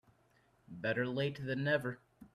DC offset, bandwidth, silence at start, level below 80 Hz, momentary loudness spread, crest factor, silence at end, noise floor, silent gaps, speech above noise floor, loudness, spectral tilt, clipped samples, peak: under 0.1%; 13 kHz; 0.7 s; -72 dBFS; 14 LU; 20 dB; 0.05 s; -71 dBFS; none; 35 dB; -36 LUFS; -7 dB/octave; under 0.1%; -18 dBFS